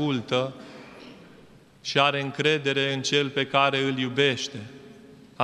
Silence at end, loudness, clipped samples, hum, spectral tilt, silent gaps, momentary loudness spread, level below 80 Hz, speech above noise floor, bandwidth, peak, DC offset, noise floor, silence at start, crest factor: 0 s; -24 LUFS; under 0.1%; none; -4 dB/octave; none; 22 LU; -68 dBFS; 27 dB; 12 kHz; -4 dBFS; under 0.1%; -52 dBFS; 0 s; 22 dB